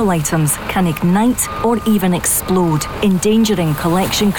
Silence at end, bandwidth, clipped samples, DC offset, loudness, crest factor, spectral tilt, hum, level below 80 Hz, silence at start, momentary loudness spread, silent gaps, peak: 0 s; over 20 kHz; under 0.1%; 0.5%; -15 LUFS; 10 dB; -5 dB/octave; none; -36 dBFS; 0 s; 3 LU; none; -6 dBFS